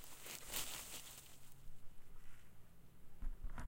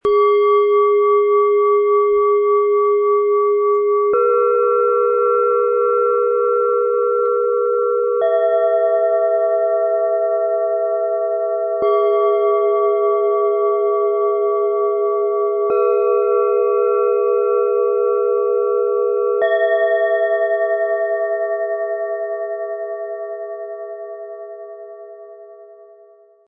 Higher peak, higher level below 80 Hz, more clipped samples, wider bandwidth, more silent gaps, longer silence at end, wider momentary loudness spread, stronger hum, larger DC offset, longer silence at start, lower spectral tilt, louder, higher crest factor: second, -26 dBFS vs -6 dBFS; first, -54 dBFS vs -66 dBFS; neither; first, 17 kHz vs 3.6 kHz; neither; second, 0 s vs 0.75 s; first, 23 LU vs 10 LU; neither; neither; about the same, 0 s vs 0.05 s; second, -1.5 dB/octave vs -7 dB/octave; second, -49 LUFS vs -17 LUFS; first, 22 dB vs 10 dB